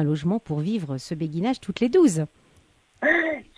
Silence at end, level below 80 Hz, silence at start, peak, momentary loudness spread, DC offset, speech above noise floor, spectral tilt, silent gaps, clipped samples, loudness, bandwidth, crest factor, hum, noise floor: 0.15 s; -58 dBFS; 0 s; -6 dBFS; 11 LU; under 0.1%; 36 dB; -6.5 dB/octave; none; under 0.1%; -24 LUFS; 11 kHz; 18 dB; none; -59 dBFS